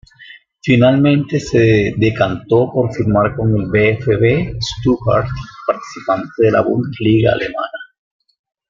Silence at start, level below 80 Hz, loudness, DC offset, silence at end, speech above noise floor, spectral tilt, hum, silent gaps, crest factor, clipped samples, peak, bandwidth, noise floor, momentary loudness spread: 0.2 s; -40 dBFS; -15 LUFS; under 0.1%; 0.85 s; 27 dB; -7.5 dB/octave; none; none; 14 dB; under 0.1%; -2 dBFS; 7.6 kHz; -41 dBFS; 9 LU